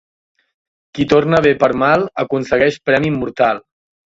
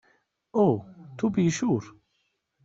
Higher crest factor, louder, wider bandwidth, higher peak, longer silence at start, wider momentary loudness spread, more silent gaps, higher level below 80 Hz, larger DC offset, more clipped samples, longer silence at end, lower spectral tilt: about the same, 16 dB vs 18 dB; first, -15 LUFS vs -26 LUFS; about the same, 7.8 kHz vs 7.8 kHz; first, 0 dBFS vs -10 dBFS; first, 0.95 s vs 0.55 s; about the same, 8 LU vs 8 LU; neither; first, -46 dBFS vs -64 dBFS; neither; neither; second, 0.55 s vs 0.75 s; about the same, -6.5 dB/octave vs -7.5 dB/octave